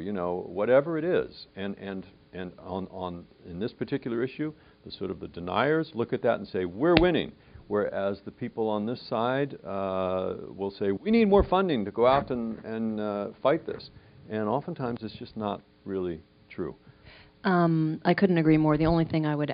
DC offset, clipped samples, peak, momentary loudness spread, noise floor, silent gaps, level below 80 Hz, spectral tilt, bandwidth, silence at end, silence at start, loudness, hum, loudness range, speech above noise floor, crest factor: under 0.1%; under 0.1%; -2 dBFS; 16 LU; -53 dBFS; none; -48 dBFS; -5.5 dB/octave; 5.2 kHz; 0 s; 0 s; -28 LUFS; none; 8 LU; 26 dB; 26 dB